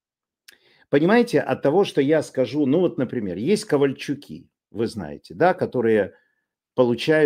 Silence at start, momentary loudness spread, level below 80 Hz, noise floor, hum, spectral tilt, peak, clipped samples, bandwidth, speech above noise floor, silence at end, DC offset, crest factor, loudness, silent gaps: 0.9 s; 12 LU; -64 dBFS; -75 dBFS; none; -6.5 dB/octave; -4 dBFS; under 0.1%; 15.5 kHz; 54 dB; 0 s; under 0.1%; 18 dB; -21 LUFS; none